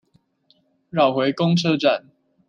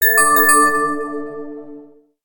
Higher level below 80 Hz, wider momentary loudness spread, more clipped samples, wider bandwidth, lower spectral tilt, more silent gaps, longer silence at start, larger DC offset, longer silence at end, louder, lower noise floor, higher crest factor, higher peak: second, -68 dBFS vs -56 dBFS; second, 7 LU vs 22 LU; neither; second, 7.4 kHz vs 19.5 kHz; first, -6.5 dB/octave vs -1.5 dB/octave; neither; first, 0.95 s vs 0 s; neither; about the same, 0.5 s vs 0.4 s; second, -20 LUFS vs -13 LUFS; first, -63 dBFS vs -42 dBFS; about the same, 18 dB vs 16 dB; second, -4 dBFS vs 0 dBFS